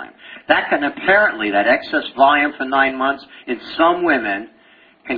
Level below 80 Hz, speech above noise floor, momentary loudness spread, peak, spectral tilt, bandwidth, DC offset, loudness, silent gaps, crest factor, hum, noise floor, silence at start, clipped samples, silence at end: -54 dBFS; 33 dB; 13 LU; 0 dBFS; -7 dB/octave; 5 kHz; under 0.1%; -16 LUFS; none; 18 dB; none; -50 dBFS; 0 s; under 0.1%; 0 s